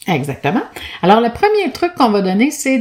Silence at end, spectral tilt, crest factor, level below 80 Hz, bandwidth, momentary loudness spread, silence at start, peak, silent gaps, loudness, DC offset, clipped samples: 0 s; -5 dB/octave; 14 dB; -48 dBFS; 16.5 kHz; 7 LU; 0.05 s; 0 dBFS; none; -15 LUFS; under 0.1%; under 0.1%